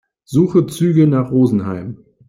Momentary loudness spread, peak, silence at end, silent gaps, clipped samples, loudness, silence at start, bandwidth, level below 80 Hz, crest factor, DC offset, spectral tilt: 12 LU; -2 dBFS; 0.35 s; none; under 0.1%; -15 LUFS; 0.3 s; 15.5 kHz; -54 dBFS; 14 dB; under 0.1%; -8.5 dB/octave